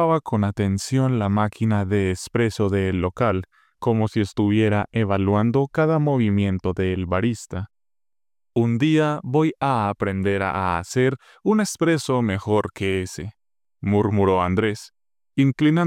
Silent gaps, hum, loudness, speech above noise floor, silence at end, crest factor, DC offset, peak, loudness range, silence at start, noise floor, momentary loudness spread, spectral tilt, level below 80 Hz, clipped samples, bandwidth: none; none; -22 LUFS; over 69 dB; 0 s; 12 dB; under 0.1%; -8 dBFS; 2 LU; 0 s; under -90 dBFS; 7 LU; -7 dB/octave; -54 dBFS; under 0.1%; 14 kHz